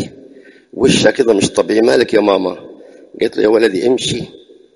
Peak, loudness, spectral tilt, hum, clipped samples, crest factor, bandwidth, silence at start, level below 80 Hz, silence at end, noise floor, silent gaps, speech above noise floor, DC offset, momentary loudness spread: 0 dBFS; -13 LUFS; -4.5 dB/octave; none; under 0.1%; 14 dB; 11.5 kHz; 0 s; -48 dBFS; 0.5 s; -41 dBFS; none; 29 dB; under 0.1%; 14 LU